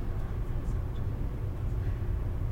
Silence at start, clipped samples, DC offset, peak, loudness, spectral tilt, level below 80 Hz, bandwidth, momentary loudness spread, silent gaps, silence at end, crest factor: 0 s; under 0.1%; under 0.1%; -20 dBFS; -35 LUFS; -8.5 dB/octave; -34 dBFS; 16 kHz; 2 LU; none; 0 s; 10 dB